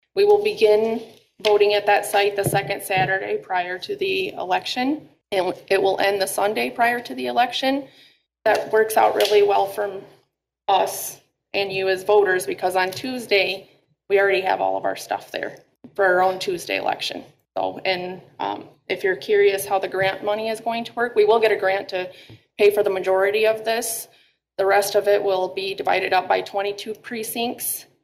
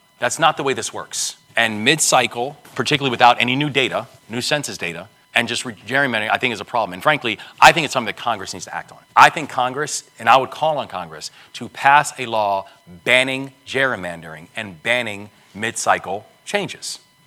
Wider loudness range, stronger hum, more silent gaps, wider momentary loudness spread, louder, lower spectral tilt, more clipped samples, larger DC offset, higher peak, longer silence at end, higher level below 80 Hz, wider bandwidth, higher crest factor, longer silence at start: about the same, 3 LU vs 4 LU; neither; neither; second, 12 LU vs 16 LU; second, -21 LUFS vs -18 LUFS; about the same, -3 dB/octave vs -2.5 dB/octave; second, under 0.1% vs 0.1%; neither; second, -6 dBFS vs 0 dBFS; about the same, 0.2 s vs 0.3 s; second, -66 dBFS vs -58 dBFS; second, 16 kHz vs 19 kHz; about the same, 16 dB vs 20 dB; about the same, 0.15 s vs 0.2 s